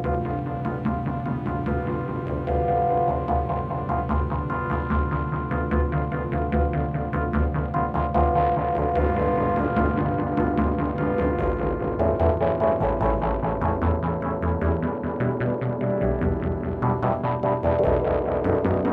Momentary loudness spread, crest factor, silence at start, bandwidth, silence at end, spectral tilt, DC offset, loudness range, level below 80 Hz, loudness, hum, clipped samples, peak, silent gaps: 5 LU; 16 dB; 0 s; 4.5 kHz; 0 s; -11 dB/octave; under 0.1%; 2 LU; -32 dBFS; -24 LUFS; none; under 0.1%; -8 dBFS; none